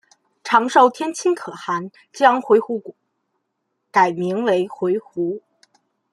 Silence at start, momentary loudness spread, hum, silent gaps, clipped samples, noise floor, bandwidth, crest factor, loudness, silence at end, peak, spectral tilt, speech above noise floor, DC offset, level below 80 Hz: 0.45 s; 13 LU; none; none; under 0.1%; -74 dBFS; 12 kHz; 20 dB; -19 LUFS; 0.75 s; 0 dBFS; -5 dB/octave; 56 dB; under 0.1%; -72 dBFS